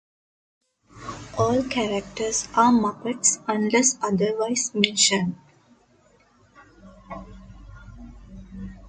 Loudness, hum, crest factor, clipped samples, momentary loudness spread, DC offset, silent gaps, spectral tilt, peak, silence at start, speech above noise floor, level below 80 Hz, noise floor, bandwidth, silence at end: -22 LUFS; none; 26 dB; under 0.1%; 22 LU; under 0.1%; none; -3 dB/octave; 0 dBFS; 0.95 s; 37 dB; -50 dBFS; -59 dBFS; 9.6 kHz; 0 s